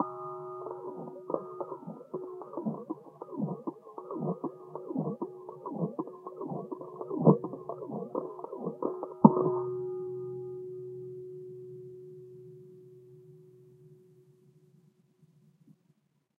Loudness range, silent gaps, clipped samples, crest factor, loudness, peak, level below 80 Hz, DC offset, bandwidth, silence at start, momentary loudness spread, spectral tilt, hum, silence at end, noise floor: 19 LU; none; under 0.1%; 32 dB; -34 LUFS; -2 dBFS; -82 dBFS; under 0.1%; 1.8 kHz; 0 s; 22 LU; -13 dB/octave; none; 0.7 s; -72 dBFS